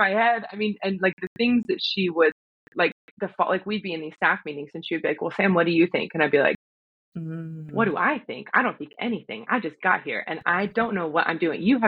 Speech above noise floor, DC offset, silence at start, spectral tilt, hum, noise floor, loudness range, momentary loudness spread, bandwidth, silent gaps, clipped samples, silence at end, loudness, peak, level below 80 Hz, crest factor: over 66 dB; under 0.1%; 0 s; -7.5 dB/octave; none; under -90 dBFS; 2 LU; 13 LU; 6.4 kHz; 1.13-1.17 s, 1.27-1.36 s, 2.32-2.72 s, 2.92-3.17 s, 6.55-7.12 s; under 0.1%; 0 s; -24 LUFS; -6 dBFS; -66 dBFS; 20 dB